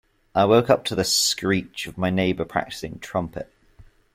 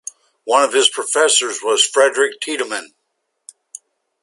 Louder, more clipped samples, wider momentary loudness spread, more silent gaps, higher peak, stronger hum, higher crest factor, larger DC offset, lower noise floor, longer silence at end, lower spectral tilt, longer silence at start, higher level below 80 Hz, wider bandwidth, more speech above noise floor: second, -22 LUFS vs -15 LUFS; neither; about the same, 15 LU vs 16 LU; neither; second, -4 dBFS vs 0 dBFS; neither; about the same, 20 dB vs 18 dB; neither; second, -52 dBFS vs -72 dBFS; second, 0.3 s vs 1.35 s; first, -4 dB/octave vs 1.5 dB/octave; about the same, 0.35 s vs 0.45 s; first, -52 dBFS vs -76 dBFS; first, 16.5 kHz vs 11.5 kHz; second, 30 dB vs 56 dB